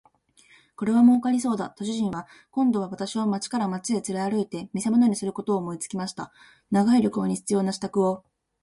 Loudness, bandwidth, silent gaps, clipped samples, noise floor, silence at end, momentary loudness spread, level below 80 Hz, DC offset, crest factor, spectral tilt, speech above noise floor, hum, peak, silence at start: -25 LUFS; 11.5 kHz; none; under 0.1%; -58 dBFS; 0.45 s; 12 LU; -66 dBFS; under 0.1%; 16 dB; -6 dB/octave; 34 dB; none; -8 dBFS; 0.8 s